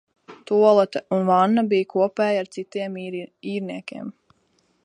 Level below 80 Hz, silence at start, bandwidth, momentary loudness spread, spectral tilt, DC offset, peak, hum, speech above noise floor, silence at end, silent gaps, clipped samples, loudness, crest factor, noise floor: -74 dBFS; 0.3 s; 10 kHz; 16 LU; -7 dB/octave; under 0.1%; -4 dBFS; none; 44 dB; 0.75 s; none; under 0.1%; -21 LUFS; 18 dB; -66 dBFS